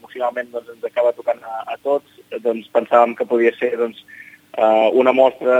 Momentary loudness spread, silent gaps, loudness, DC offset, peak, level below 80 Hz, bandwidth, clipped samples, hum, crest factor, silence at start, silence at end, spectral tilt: 14 LU; none; -18 LUFS; under 0.1%; 0 dBFS; -76 dBFS; 14 kHz; under 0.1%; none; 18 dB; 0.15 s; 0 s; -5.5 dB/octave